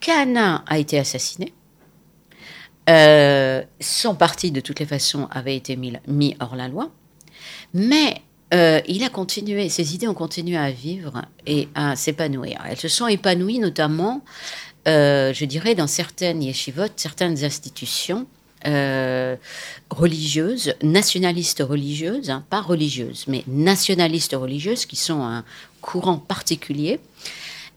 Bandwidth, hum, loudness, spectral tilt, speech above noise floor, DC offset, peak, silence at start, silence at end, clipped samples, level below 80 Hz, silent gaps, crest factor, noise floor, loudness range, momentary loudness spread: 17 kHz; none; -20 LUFS; -4 dB/octave; 34 dB; under 0.1%; 0 dBFS; 0 s; 0.05 s; under 0.1%; -58 dBFS; none; 20 dB; -54 dBFS; 7 LU; 14 LU